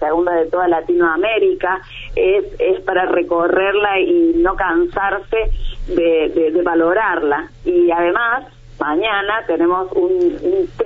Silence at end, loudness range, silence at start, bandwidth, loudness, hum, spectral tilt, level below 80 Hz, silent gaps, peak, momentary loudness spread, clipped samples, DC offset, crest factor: 0 s; 1 LU; 0 s; 4 kHz; -16 LUFS; none; -7 dB/octave; -32 dBFS; none; -2 dBFS; 6 LU; under 0.1%; under 0.1%; 14 dB